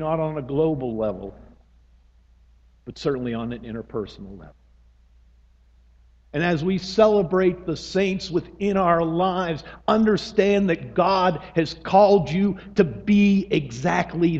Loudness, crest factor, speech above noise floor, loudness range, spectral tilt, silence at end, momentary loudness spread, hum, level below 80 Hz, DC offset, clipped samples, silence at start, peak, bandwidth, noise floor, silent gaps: -22 LUFS; 20 dB; 33 dB; 12 LU; -7 dB/octave; 0 s; 14 LU; none; -48 dBFS; under 0.1%; under 0.1%; 0 s; -2 dBFS; 7.8 kHz; -55 dBFS; none